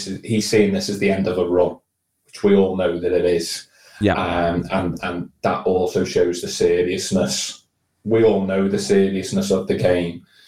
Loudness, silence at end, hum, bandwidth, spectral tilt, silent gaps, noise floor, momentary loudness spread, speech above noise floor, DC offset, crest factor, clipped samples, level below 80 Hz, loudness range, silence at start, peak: -20 LUFS; 0.3 s; none; 15.5 kHz; -5 dB/octave; none; -63 dBFS; 7 LU; 44 dB; 0.2%; 18 dB; under 0.1%; -48 dBFS; 2 LU; 0 s; -2 dBFS